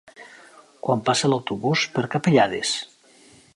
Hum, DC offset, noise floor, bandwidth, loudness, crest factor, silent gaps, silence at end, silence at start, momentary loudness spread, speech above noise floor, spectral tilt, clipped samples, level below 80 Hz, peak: none; under 0.1%; -53 dBFS; 11.5 kHz; -22 LUFS; 20 dB; none; 0.7 s; 0.2 s; 9 LU; 31 dB; -4.5 dB/octave; under 0.1%; -64 dBFS; -4 dBFS